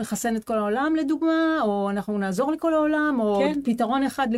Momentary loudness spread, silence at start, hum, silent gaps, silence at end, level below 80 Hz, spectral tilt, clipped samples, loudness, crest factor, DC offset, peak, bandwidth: 4 LU; 0 s; none; none; 0 s; -58 dBFS; -5.5 dB/octave; under 0.1%; -23 LUFS; 12 dB; under 0.1%; -10 dBFS; 15.5 kHz